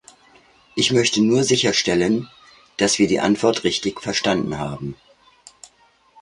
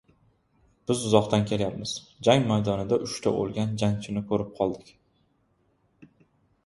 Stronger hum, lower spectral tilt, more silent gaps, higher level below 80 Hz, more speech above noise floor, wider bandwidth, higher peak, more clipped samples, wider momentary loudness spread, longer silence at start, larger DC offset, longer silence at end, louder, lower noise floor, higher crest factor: neither; second, -3.5 dB/octave vs -6 dB/octave; neither; about the same, -52 dBFS vs -56 dBFS; second, 38 dB vs 43 dB; about the same, 11.5 kHz vs 11.5 kHz; about the same, -2 dBFS vs -4 dBFS; neither; first, 14 LU vs 9 LU; second, 0.75 s vs 0.9 s; neither; first, 1.3 s vs 0.6 s; first, -19 LUFS vs -26 LUFS; second, -57 dBFS vs -69 dBFS; second, 18 dB vs 24 dB